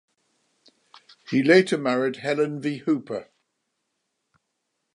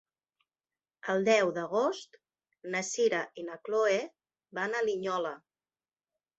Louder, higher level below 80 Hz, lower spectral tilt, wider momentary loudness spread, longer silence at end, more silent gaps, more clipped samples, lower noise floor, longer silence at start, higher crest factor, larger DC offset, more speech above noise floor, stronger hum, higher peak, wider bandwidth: first, -22 LUFS vs -31 LUFS; about the same, -78 dBFS vs -80 dBFS; first, -6 dB/octave vs -3.5 dB/octave; second, 11 LU vs 16 LU; first, 1.7 s vs 1 s; neither; neither; second, -78 dBFS vs under -90 dBFS; first, 1.3 s vs 1.05 s; about the same, 22 dB vs 20 dB; neither; second, 56 dB vs over 60 dB; neither; first, -4 dBFS vs -14 dBFS; first, 11 kHz vs 8.2 kHz